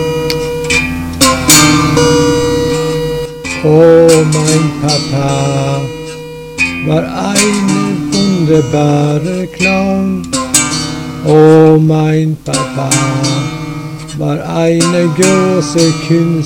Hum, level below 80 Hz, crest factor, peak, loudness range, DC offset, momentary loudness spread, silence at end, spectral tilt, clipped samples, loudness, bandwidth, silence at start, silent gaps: none; -34 dBFS; 10 dB; 0 dBFS; 4 LU; under 0.1%; 12 LU; 0 s; -4.5 dB/octave; 0.9%; -10 LUFS; over 20 kHz; 0 s; none